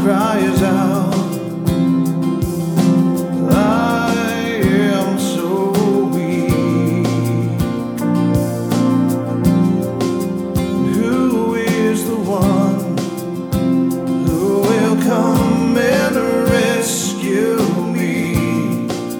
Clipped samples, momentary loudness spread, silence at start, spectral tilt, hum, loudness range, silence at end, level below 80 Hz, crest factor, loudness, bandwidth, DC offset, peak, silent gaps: under 0.1%; 5 LU; 0 s; -6 dB/octave; none; 2 LU; 0 s; -38 dBFS; 14 dB; -16 LUFS; over 20 kHz; under 0.1%; -2 dBFS; none